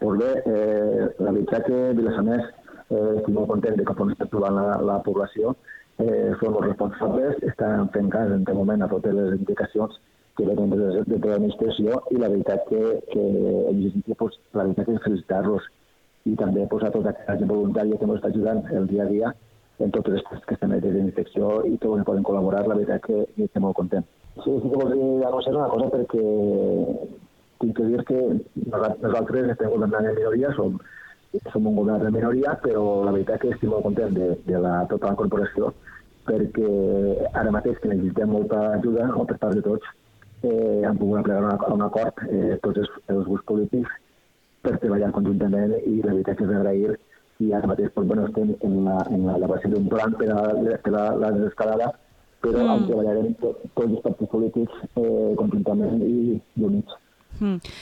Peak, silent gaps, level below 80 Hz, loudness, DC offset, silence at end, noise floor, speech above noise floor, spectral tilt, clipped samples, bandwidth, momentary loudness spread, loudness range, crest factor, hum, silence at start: -8 dBFS; none; -50 dBFS; -23 LUFS; under 0.1%; 0 s; -61 dBFS; 39 dB; -9.5 dB/octave; under 0.1%; 5.4 kHz; 5 LU; 2 LU; 16 dB; none; 0 s